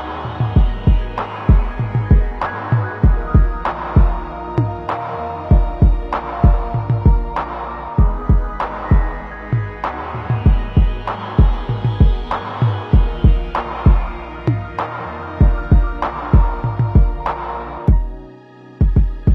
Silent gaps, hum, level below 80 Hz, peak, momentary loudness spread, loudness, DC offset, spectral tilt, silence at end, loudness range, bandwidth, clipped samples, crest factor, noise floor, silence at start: none; none; -18 dBFS; 0 dBFS; 9 LU; -18 LUFS; under 0.1%; -10 dB/octave; 0 s; 2 LU; 4.7 kHz; under 0.1%; 16 dB; -40 dBFS; 0 s